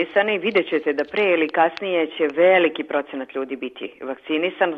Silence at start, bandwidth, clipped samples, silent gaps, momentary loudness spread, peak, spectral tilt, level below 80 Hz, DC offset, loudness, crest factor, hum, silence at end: 0 s; 5.8 kHz; under 0.1%; none; 14 LU; -4 dBFS; -6.5 dB/octave; -70 dBFS; under 0.1%; -21 LUFS; 16 dB; none; 0 s